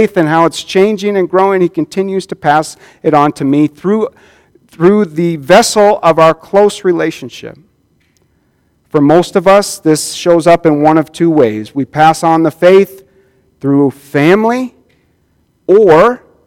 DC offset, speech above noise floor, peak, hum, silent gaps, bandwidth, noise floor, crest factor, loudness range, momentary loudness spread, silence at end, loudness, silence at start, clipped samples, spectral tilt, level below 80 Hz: under 0.1%; 46 dB; 0 dBFS; none; none; 16.5 kHz; -56 dBFS; 10 dB; 4 LU; 10 LU; 0.3 s; -10 LUFS; 0 s; 0.9%; -5.5 dB/octave; -48 dBFS